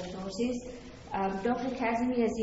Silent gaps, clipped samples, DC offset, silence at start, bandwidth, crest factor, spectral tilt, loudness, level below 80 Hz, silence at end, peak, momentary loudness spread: none; under 0.1%; under 0.1%; 0 s; 8 kHz; 14 dB; -5.5 dB/octave; -32 LUFS; -54 dBFS; 0 s; -18 dBFS; 10 LU